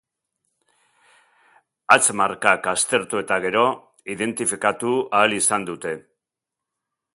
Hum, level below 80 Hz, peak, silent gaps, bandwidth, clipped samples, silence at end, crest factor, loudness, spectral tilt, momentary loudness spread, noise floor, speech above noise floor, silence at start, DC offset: none; -66 dBFS; 0 dBFS; none; 12 kHz; under 0.1%; 1.15 s; 22 dB; -20 LUFS; -2 dB/octave; 14 LU; -86 dBFS; 65 dB; 1.9 s; under 0.1%